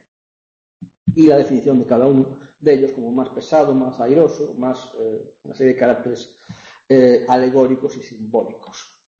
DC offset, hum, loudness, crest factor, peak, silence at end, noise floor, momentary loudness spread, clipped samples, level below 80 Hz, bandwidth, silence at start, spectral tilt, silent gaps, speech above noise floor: under 0.1%; none; -13 LUFS; 14 dB; 0 dBFS; 0.35 s; under -90 dBFS; 16 LU; under 0.1%; -54 dBFS; 7.4 kHz; 0.8 s; -7.5 dB/octave; 0.97-1.06 s; over 77 dB